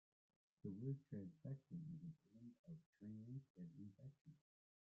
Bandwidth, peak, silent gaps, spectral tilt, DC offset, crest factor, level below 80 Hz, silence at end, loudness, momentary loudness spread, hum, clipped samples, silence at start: 5.8 kHz; -38 dBFS; 2.59-2.64 s, 2.86-2.93 s, 3.50-3.55 s, 4.21-4.25 s; -12 dB/octave; under 0.1%; 18 dB; -88 dBFS; 0.65 s; -56 LUFS; 13 LU; none; under 0.1%; 0.65 s